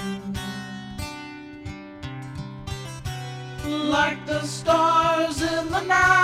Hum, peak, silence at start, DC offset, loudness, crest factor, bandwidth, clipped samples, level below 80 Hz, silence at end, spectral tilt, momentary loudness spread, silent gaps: none; -6 dBFS; 0 s; under 0.1%; -24 LUFS; 18 dB; 16 kHz; under 0.1%; -46 dBFS; 0 s; -4.5 dB/octave; 18 LU; none